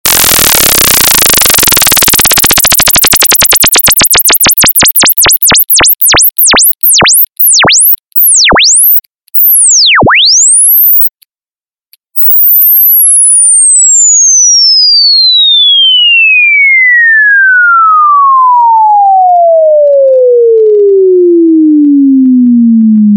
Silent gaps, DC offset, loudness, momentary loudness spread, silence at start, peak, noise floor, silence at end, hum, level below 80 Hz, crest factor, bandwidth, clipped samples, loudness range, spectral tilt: none; under 0.1%; -2 LUFS; 4 LU; 0.05 s; 0 dBFS; under -90 dBFS; 0 s; none; -32 dBFS; 4 dB; over 20 kHz; 1%; 4 LU; -1 dB/octave